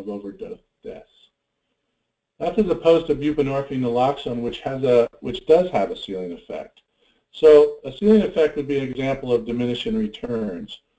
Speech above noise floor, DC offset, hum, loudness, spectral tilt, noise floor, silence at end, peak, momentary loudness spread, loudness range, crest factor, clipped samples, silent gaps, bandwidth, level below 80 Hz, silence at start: 57 dB; under 0.1%; none; -20 LUFS; -7.5 dB/octave; -77 dBFS; 0.2 s; -2 dBFS; 18 LU; 5 LU; 18 dB; under 0.1%; none; 8 kHz; -50 dBFS; 0 s